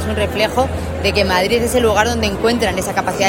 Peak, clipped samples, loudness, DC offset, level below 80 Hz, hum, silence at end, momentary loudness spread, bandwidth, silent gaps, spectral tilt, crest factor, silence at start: 0 dBFS; under 0.1%; -16 LUFS; under 0.1%; -34 dBFS; none; 0 s; 5 LU; 16.5 kHz; none; -4.5 dB/octave; 16 dB; 0 s